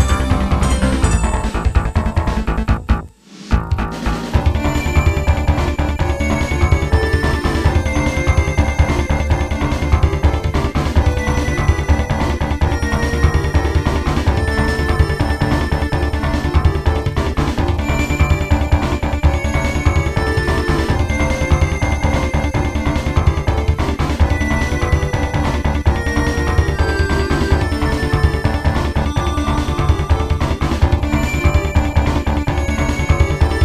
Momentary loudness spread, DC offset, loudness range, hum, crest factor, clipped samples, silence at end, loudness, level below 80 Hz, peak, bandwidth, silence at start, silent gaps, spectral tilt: 3 LU; under 0.1%; 1 LU; none; 16 dB; under 0.1%; 0 s; -17 LUFS; -18 dBFS; 0 dBFS; 13 kHz; 0 s; none; -6 dB/octave